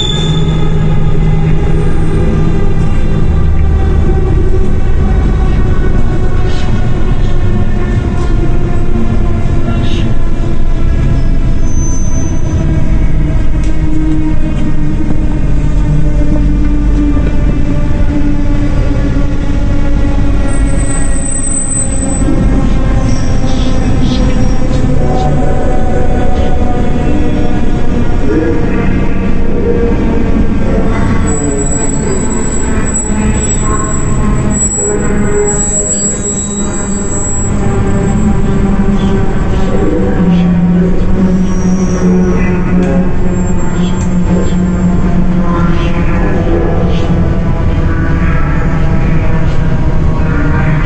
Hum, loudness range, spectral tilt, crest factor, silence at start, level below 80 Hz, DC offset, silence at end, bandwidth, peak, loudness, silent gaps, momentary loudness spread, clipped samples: none; 3 LU; -6 dB/octave; 8 dB; 0 s; -12 dBFS; under 0.1%; 0 s; 8.8 kHz; 0 dBFS; -13 LUFS; none; 4 LU; under 0.1%